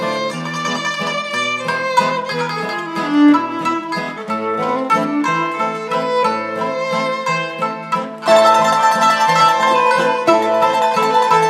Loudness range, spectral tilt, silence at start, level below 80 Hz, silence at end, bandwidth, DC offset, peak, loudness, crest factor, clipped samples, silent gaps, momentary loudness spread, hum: 5 LU; -4 dB/octave; 0 s; -74 dBFS; 0 s; 15 kHz; under 0.1%; 0 dBFS; -16 LUFS; 16 dB; under 0.1%; none; 9 LU; none